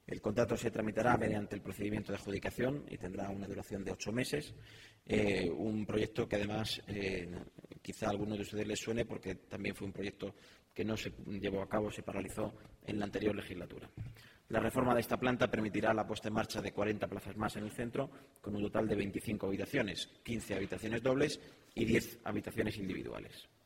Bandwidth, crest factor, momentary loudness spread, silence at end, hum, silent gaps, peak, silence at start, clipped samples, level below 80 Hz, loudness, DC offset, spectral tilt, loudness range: 16 kHz; 22 dB; 14 LU; 0.2 s; none; none; -16 dBFS; 0.1 s; under 0.1%; -60 dBFS; -38 LUFS; under 0.1%; -5.5 dB/octave; 5 LU